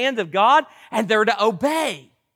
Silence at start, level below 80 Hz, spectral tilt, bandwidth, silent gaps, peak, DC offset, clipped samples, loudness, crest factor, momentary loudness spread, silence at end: 0 s; -70 dBFS; -3.5 dB/octave; 17 kHz; none; -6 dBFS; under 0.1%; under 0.1%; -19 LUFS; 14 dB; 11 LU; 0.35 s